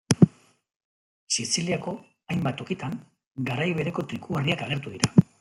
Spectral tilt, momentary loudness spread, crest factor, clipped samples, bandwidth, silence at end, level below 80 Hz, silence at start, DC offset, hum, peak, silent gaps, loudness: -5 dB/octave; 13 LU; 24 dB; under 0.1%; 12 kHz; 0.15 s; -60 dBFS; 0.1 s; under 0.1%; none; -2 dBFS; 0.76-1.27 s, 3.27-3.31 s; -26 LUFS